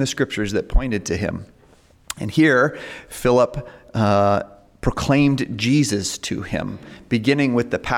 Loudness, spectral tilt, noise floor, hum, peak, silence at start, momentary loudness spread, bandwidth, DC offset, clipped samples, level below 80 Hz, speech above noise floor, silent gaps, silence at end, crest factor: -20 LUFS; -5.5 dB/octave; -52 dBFS; none; -6 dBFS; 0 s; 15 LU; 16.5 kHz; under 0.1%; under 0.1%; -32 dBFS; 33 dB; none; 0 s; 14 dB